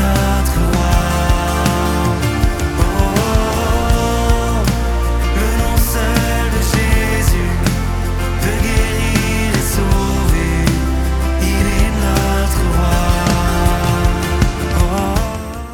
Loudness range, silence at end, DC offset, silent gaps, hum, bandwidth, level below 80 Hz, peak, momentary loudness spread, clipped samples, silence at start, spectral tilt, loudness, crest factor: 1 LU; 0 s; under 0.1%; none; none; 18.5 kHz; -18 dBFS; 0 dBFS; 3 LU; under 0.1%; 0 s; -5 dB/octave; -16 LUFS; 14 dB